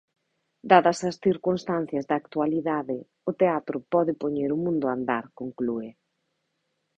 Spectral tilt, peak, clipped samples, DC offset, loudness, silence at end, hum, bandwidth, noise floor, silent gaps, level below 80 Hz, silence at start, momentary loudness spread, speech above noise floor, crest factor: -6.5 dB/octave; -4 dBFS; under 0.1%; under 0.1%; -26 LUFS; 1.05 s; none; 9 kHz; -77 dBFS; none; -66 dBFS; 0.65 s; 13 LU; 52 dB; 22 dB